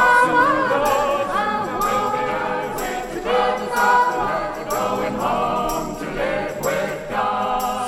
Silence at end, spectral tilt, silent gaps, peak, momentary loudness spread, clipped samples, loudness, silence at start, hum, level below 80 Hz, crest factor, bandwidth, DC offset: 0 s; -4 dB/octave; none; -4 dBFS; 9 LU; under 0.1%; -20 LUFS; 0 s; none; -42 dBFS; 16 dB; 16.5 kHz; under 0.1%